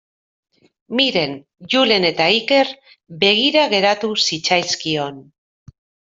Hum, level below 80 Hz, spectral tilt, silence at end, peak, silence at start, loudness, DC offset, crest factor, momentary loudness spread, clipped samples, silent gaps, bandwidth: none; -62 dBFS; -3 dB/octave; 0.9 s; -2 dBFS; 0.9 s; -16 LUFS; under 0.1%; 18 dB; 9 LU; under 0.1%; none; 7.8 kHz